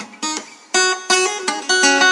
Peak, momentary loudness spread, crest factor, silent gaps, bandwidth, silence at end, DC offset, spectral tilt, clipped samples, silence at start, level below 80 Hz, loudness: 0 dBFS; 11 LU; 16 dB; none; 11.5 kHz; 0 s; under 0.1%; 0.5 dB/octave; under 0.1%; 0 s; -72 dBFS; -16 LUFS